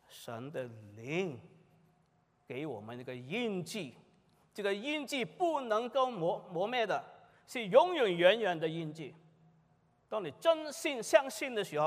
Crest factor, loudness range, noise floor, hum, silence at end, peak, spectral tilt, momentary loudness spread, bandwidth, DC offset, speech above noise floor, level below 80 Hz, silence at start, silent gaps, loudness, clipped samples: 24 dB; 11 LU; -72 dBFS; none; 0 s; -10 dBFS; -4.5 dB/octave; 17 LU; 15.5 kHz; under 0.1%; 39 dB; -84 dBFS; 0.1 s; none; -34 LUFS; under 0.1%